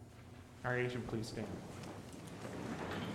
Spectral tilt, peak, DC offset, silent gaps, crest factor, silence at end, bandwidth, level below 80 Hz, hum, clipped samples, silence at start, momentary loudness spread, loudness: -5.5 dB/octave; -26 dBFS; under 0.1%; none; 18 dB; 0 s; 16 kHz; -64 dBFS; none; under 0.1%; 0 s; 14 LU; -43 LUFS